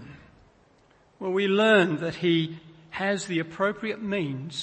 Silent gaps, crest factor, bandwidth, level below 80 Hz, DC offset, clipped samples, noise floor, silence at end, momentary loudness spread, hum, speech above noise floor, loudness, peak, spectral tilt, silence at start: none; 18 dB; 8.8 kHz; -64 dBFS; under 0.1%; under 0.1%; -60 dBFS; 0 s; 14 LU; none; 35 dB; -25 LUFS; -8 dBFS; -5.5 dB/octave; 0 s